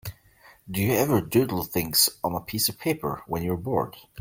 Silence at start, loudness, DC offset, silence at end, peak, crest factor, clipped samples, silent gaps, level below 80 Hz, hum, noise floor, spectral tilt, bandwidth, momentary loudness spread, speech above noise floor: 0.05 s; -25 LUFS; under 0.1%; 0 s; -6 dBFS; 20 dB; under 0.1%; none; -54 dBFS; none; -55 dBFS; -4 dB/octave; 16.5 kHz; 10 LU; 30 dB